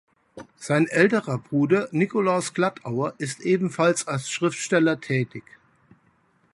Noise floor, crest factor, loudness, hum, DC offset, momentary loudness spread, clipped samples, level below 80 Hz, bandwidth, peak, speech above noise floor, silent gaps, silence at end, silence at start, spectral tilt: -63 dBFS; 20 dB; -23 LUFS; none; under 0.1%; 8 LU; under 0.1%; -66 dBFS; 11.5 kHz; -4 dBFS; 40 dB; none; 1.15 s; 0.35 s; -5.5 dB/octave